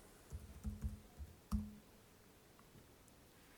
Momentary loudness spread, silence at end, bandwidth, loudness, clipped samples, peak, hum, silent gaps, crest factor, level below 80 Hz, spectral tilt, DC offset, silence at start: 19 LU; 0 s; over 20 kHz; -50 LUFS; under 0.1%; -28 dBFS; none; none; 24 dB; -54 dBFS; -6.5 dB/octave; under 0.1%; 0 s